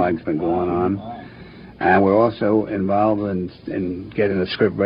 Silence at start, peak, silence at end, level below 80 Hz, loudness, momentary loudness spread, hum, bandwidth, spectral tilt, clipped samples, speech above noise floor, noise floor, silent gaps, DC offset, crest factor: 0 s; -4 dBFS; 0 s; -50 dBFS; -20 LUFS; 12 LU; none; 5.4 kHz; -10 dB/octave; under 0.1%; 21 dB; -40 dBFS; none; under 0.1%; 16 dB